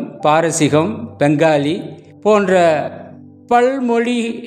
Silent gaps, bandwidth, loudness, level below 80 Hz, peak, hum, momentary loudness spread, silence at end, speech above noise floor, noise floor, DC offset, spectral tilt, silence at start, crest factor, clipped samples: none; 14.5 kHz; -15 LUFS; -62 dBFS; 0 dBFS; none; 10 LU; 0 s; 23 dB; -37 dBFS; under 0.1%; -5.5 dB/octave; 0 s; 16 dB; under 0.1%